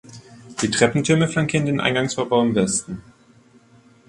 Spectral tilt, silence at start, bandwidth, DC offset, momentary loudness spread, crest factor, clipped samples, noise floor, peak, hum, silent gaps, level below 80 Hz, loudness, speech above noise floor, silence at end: -4.5 dB/octave; 0.1 s; 11.5 kHz; under 0.1%; 10 LU; 20 dB; under 0.1%; -52 dBFS; -2 dBFS; none; none; -52 dBFS; -20 LUFS; 33 dB; 1.1 s